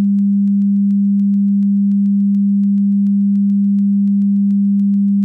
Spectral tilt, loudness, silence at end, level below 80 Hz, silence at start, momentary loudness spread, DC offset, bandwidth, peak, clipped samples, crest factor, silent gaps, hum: -12.5 dB/octave; -14 LUFS; 0 s; -70 dBFS; 0 s; 0 LU; under 0.1%; 0.3 kHz; -10 dBFS; under 0.1%; 4 dB; none; none